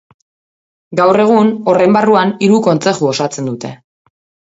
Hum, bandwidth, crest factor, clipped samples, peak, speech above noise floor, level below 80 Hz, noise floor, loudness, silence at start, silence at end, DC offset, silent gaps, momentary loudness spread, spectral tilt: none; 8 kHz; 14 dB; under 0.1%; 0 dBFS; over 79 dB; -58 dBFS; under -90 dBFS; -12 LUFS; 0.9 s; 0.75 s; under 0.1%; none; 12 LU; -6 dB/octave